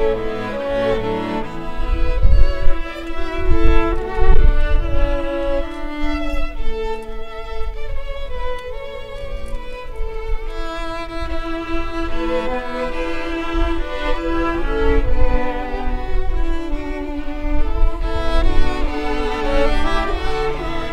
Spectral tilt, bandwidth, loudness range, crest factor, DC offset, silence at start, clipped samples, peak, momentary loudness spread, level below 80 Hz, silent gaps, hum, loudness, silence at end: -7 dB/octave; 6 kHz; 8 LU; 16 dB; under 0.1%; 0 s; under 0.1%; 0 dBFS; 11 LU; -20 dBFS; none; none; -23 LUFS; 0 s